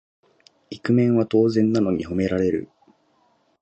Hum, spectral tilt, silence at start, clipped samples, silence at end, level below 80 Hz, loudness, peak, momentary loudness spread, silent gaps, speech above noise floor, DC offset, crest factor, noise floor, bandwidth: none; -8 dB/octave; 0.7 s; under 0.1%; 0.95 s; -50 dBFS; -21 LUFS; -8 dBFS; 10 LU; none; 44 dB; under 0.1%; 16 dB; -63 dBFS; 8.2 kHz